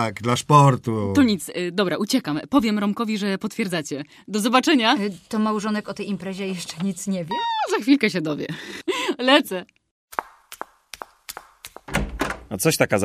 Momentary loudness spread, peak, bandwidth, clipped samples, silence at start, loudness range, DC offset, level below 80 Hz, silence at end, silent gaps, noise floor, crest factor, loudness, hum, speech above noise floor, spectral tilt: 18 LU; -2 dBFS; 15.5 kHz; under 0.1%; 0 s; 5 LU; under 0.1%; -46 dBFS; 0 s; 9.91-10.08 s; -44 dBFS; 20 dB; -22 LUFS; none; 23 dB; -5 dB/octave